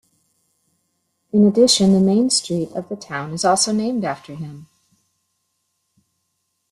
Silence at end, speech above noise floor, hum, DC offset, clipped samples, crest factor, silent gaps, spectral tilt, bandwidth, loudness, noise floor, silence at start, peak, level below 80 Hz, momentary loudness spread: 2.1 s; 55 dB; none; under 0.1%; under 0.1%; 18 dB; none; -4.5 dB/octave; 12.5 kHz; -17 LUFS; -72 dBFS; 1.35 s; -2 dBFS; -60 dBFS; 17 LU